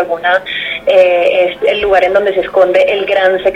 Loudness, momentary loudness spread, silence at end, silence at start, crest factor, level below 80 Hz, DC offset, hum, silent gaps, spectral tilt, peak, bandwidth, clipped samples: -11 LUFS; 4 LU; 0 s; 0 s; 10 dB; -44 dBFS; 0.1%; none; none; -4.5 dB/octave; 0 dBFS; 8 kHz; under 0.1%